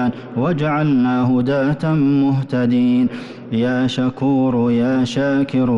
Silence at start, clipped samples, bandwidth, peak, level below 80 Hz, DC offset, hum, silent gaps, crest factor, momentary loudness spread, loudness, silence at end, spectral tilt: 0 s; under 0.1%; 7.8 kHz; -8 dBFS; -50 dBFS; under 0.1%; none; none; 8 dB; 5 LU; -17 LUFS; 0 s; -8 dB/octave